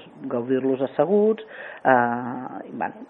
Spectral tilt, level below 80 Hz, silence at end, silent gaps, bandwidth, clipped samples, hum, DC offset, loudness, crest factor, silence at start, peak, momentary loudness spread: -10 dB/octave; -74 dBFS; 0.05 s; none; 4 kHz; under 0.1%; none; under 0.1%; -23 LUFS; 20 dB; 0 s; -2 dBFS; 13 LU